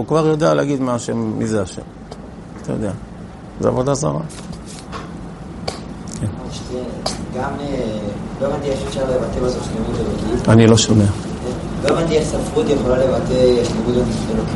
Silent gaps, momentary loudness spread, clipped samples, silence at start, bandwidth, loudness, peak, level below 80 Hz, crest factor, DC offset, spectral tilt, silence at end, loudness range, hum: none; 17 LU; under 0.1%; 0 s; 11.5 kHz; -18 LUFS; 0 dBFS; -34 dBFS; 18 dB; under 0.1%; -6 dB/octave; 0 s; 10 LU; none